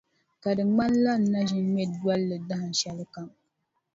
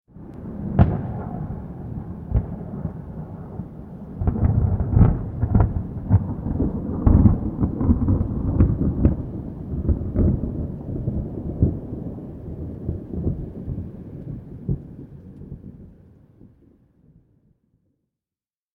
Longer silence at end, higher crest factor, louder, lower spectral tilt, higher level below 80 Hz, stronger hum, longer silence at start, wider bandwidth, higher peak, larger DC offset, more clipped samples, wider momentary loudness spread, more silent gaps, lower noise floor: second, 0.65 s vs 2.8 s; second, 14 dB vs 22 dB; about the same, -26 LUFS vs -24 LUFS; second, -5.5 dB/octave vs -13 dB/octave; second, -62 dBFS vs -30 dBFS; neither; first, 0.45 s vs 0.15 s; first, 7.8 kHz vs 3 kHz; second, -12 dBFS vs 0 dBFS; neither; neither; about the same, 15 LU vs 16 LU; neither; second, -77 dBFS vs under -90 dBFS